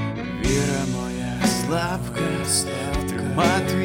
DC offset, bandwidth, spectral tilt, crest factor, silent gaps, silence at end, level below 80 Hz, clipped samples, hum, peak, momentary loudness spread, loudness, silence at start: under 0.1%; 17 kHz; -4.5 dB/octave; 18 dB; none; 0 s; -36 dBFS; under 0.1%; none; -6 dBFS; 6 LU; -23 LUFS; 0 s